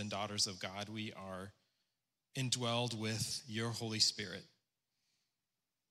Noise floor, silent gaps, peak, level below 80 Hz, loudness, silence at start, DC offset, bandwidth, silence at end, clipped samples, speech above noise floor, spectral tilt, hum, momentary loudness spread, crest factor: under -90 dBFS; none; -16 dBFS; -78 dBFS; -38 LUFS; 0 s; under 0.1%; 16 kHz; 1.45 s; under 0.1%; over 50 dB; -3 dB/octave; none; 15 LU; 26 dB